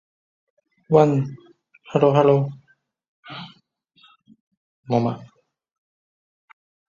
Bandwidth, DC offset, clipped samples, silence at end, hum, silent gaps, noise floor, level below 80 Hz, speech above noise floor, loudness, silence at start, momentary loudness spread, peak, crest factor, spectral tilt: 7.4 kHz; under 0.1%; under 0.1%; 1.7 s; none; 3.08-3.23 s, 4.40-4.51 s, 4.57-4.83 s; -61 dBFS; -64 dBFS; 43 dB; -20 LUFS; 0.9 s; 21 LU; -2 dBFS; 22 dB; -8.5 dB/octave